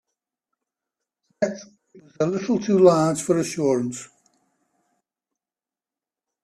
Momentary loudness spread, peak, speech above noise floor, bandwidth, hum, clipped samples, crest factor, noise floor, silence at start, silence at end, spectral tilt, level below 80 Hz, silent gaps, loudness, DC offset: 13 LU; -4 dBFS; over 69 dB; 13.5 kHz; none; under 0.1%; 22 dB; under -90 dBFS; 1.4 s; 2.4 s; -6 dB/octave; -66 dBFS; none; -21 LUFS; under 0.1%